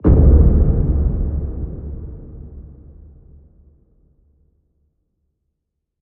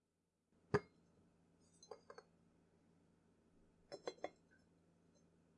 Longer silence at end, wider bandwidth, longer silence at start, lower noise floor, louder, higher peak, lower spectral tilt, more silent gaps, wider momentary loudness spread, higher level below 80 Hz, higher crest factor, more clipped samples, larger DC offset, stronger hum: first, 3.3 s vs 1.25 s; second, 1.9 kHz vs 10 kHz; second, 0.05 s vs 0.7 s; second, -77 dBFS vs -87 dBFS; first, -17 LUFS vs -47 LUFS; first, 0 dBFS vs -24 dBFS; first, -14 dB/octave vs -6 dB/octave; neither; first, 26 LU vs 21 LU; first, -20 dBFS vs -82 dBFS; second, 18 dB vs 30 dB; neither; neither; neither